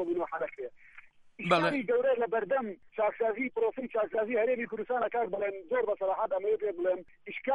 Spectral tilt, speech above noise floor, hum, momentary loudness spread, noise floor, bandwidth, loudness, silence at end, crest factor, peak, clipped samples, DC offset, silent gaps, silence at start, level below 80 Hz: -6.5 dB/octave; 24 dB; none; 9 LU; -55 dBFS; 11 kHz; -31 LUFS; 0 s; 18 dB; -12 dBFS; under 0.1%; under 0.1%; none; 0 s; -72 dBFS